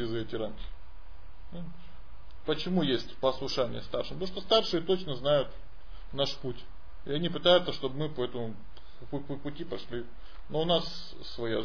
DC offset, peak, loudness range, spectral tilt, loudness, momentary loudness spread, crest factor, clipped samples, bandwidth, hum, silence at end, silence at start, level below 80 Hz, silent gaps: 2%; -10 dBFS; 5 LU; -6 dB/octave; -31 LUFS; 19 LU; 24 dB; under 0.1%; 5.4 kHz; none; 0 s; 0 s; -50 dBFS; none